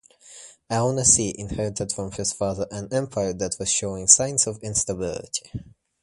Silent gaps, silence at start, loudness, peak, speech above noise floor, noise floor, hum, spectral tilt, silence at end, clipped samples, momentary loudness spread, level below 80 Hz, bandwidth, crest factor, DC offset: none; 0.25 s; -22 LUFS; 0 dBFS; 23 dB; -47 dBFS; none; -3 dB/octave; 0.35 s; under 0.1%; 15 LU; -48 dBFS; 11.5 kHz; 24 dB; under 0.1%